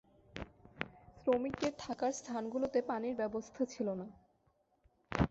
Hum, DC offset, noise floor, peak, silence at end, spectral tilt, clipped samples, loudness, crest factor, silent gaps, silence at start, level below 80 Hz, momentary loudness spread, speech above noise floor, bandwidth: none; under 0.1%; -75 dBFS; -14 dBFS; 0 s; -5.5 dB/octave; under 0.1%; -38 LUFS; 24 dB; none; 0.35 s; -56 dBFS; 15 LU; 39 dB; 8 kHz